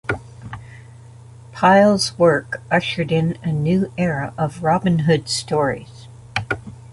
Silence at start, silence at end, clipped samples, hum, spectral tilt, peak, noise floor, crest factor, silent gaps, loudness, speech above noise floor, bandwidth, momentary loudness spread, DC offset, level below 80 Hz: 0.1 s; 0 s; under 0.1%; none; -5.5 dB/octave; -2 dBFS; -41 dBFS; 18 dB; none; -19 LUFS; 23 dB; 11.5 kHz; 15 LU; under 0.1%; -48 dBFS